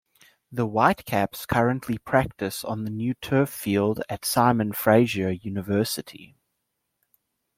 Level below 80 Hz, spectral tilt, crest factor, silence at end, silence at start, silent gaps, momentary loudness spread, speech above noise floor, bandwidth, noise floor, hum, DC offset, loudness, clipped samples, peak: -56 dBFS; -5.5 dB/octave; 22 dB; 1.3 s; 0.5 s; none; 10 LU; 55 dB; 16.5 kHz; -78 dBFS; none; under 0.1%; -24 LUFS; under 0.1%; -4 dBFS